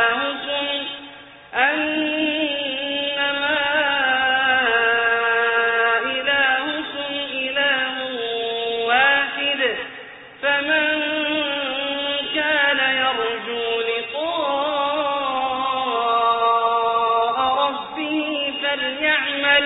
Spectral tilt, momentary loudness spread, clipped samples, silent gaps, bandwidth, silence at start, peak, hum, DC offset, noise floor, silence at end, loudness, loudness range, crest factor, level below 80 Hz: 1.5 dB/octave; 7 LU; under 0.1%; none; 4.1 kHz; 0 s; -4 dBFS; none; under 0.1%; -41 dBFS; 0 s; -20 LUFS; 3 LU; 18 dB; -60 dBFS